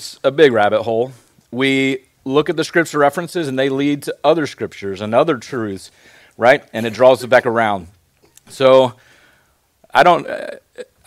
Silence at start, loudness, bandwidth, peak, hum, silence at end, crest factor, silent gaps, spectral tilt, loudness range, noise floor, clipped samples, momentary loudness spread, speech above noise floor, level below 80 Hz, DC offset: 0 s; -16 LUFS; 15 kHz; 0 dBFS; none; 0.25 s; 16 dB; none; -5 dB/octave; 3 LU; -58 dBFS; 0.1%; 14 LU; 43 dB; -58 dBFS; under 0.1%